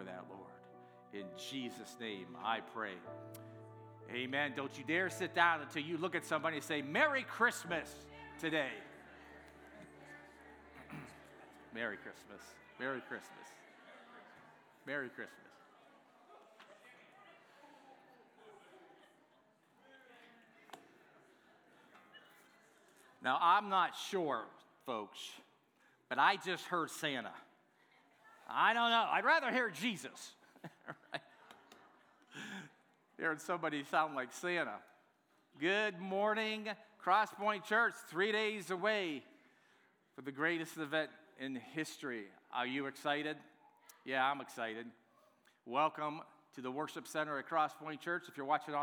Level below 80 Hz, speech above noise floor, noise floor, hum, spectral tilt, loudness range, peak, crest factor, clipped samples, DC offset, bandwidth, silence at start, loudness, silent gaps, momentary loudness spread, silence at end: -82 dBFS; 36 dB; -74 dBFS; none; -3.5 dB/octave; 14 LU; -16 dBFS; 24 dB; under 0.1%; under 0.1%; over 20 kHz; 0 s; -37 LUFS; none; 24 LU; 0 s